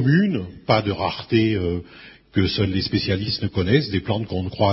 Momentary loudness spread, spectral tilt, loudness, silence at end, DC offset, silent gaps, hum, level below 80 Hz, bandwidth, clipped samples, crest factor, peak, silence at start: 7 LU; -10.5 dB/octave; -22 LUFS; 0 s; under 0.1%; none; none; -44 dBFS; 5.8 kHz; under 0.1%; 18 dB; -2 dBFS; 0 s